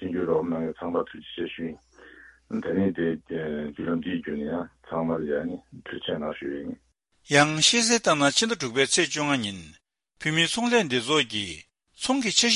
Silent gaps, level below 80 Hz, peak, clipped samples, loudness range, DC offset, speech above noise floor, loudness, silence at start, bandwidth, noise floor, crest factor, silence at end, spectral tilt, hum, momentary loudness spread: none; -58 dBFS; -6 dBFS; under 0.1%; 8 LU; under 0.1%; 25 dB; -25 LUFS; 0 s; 11.5 kHz; -51 dBFS; 20 dB; 0 s; -3 dB/octave; none; 14 LU